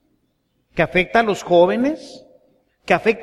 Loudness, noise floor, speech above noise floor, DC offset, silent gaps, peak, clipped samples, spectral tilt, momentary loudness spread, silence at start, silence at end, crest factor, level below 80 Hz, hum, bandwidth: -18 LUFS; -67 dBFS; 50 dB; under 0.1%; none; -2 dBFS; under 0.1%; -5.5 dB/octave; 9 LU; 0.75 s; 0 s; 18 dB; -48 dBFS; none; 13 kHz